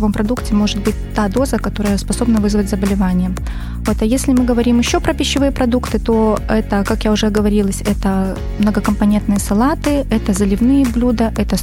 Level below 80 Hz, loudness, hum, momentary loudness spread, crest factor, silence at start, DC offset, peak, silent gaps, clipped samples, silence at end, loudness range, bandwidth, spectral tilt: -24 dBFS; -16 LUFS; none; 5 LU; 12 dB; 0 s; under 0.1%; -2 dBFS; none; under 0.1%; 0 s; 1 LU; 16.5 kHz; -5.5 dB/octave